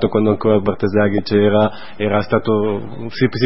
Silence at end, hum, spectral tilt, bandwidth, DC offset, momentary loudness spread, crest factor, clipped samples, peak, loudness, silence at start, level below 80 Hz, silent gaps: 0 s; none; -11 dB/octave; 5.8 kHz; 3%; 7 LU; 16 dB; under 0.1%; 0 dBFS; -17 LUFS; 0 s; -46 dBFS; none